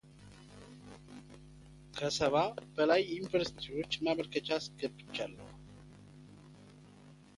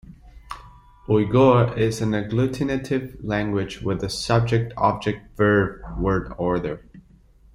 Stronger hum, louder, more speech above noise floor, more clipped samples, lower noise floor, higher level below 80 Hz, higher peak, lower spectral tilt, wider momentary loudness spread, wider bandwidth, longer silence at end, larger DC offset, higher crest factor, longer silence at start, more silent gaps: first, 50 Hz at -55 dBFS vs none; second, -34 LUFS vs -22 LUFS; second, 23 dB vs 31 dB; neither; first, -57 dBFS vs -52 dBFS; second, -64 dBFS vs -42 dBFS; second, -16 dBFS vs -4 dBFS; second, -4.5 dB/octave vs -7 dB/octave; first, 25 LU vs 13 LU; about the same, 11.5 kHz vs 12.5 kHz; second, 0.25 s vs 0.55 s; neither; about the same, 20 dB vs 18 dB; about the same, 0.15 s vs 0.1 s; neither